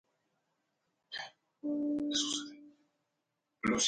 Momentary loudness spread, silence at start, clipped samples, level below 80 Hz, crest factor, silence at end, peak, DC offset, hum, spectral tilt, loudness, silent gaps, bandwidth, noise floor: 14 LU; 1.1 s; under 0.1%; -70 dBFS; 20 dB; 0 s; -20 dBFS; under 0.1%; none; -2 dB/octave; -36 LUFS; none; 10.5 kHz; -85 dBFS